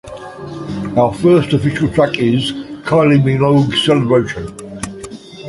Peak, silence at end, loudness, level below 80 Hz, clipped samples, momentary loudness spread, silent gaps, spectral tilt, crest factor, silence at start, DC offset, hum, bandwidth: 0 dBFS; 0 s; -14 LUFS; -42 dBFS; under 0.1%; 17 LU; none; -6.5 dB/octave; 14 dB; 0.05 s; under 0.1%; none; 11.5 kHz